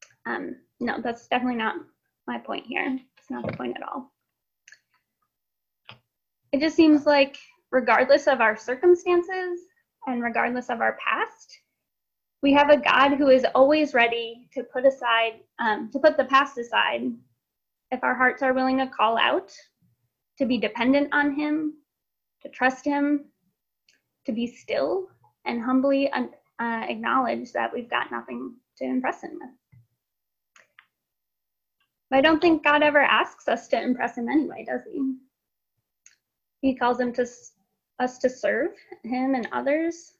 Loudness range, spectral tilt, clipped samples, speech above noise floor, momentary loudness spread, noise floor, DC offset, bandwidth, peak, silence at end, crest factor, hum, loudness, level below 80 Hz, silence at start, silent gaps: 11 LU; -4.5 dB/octave; under 0.1%; 62 dB; 15 LU; -85 dBFS; under 0.1%; 7.6 kHz; -4 dBFS; 0.2 s; 20 dB; none; -23 LUFS; -64 dBFS; 0.25 s; none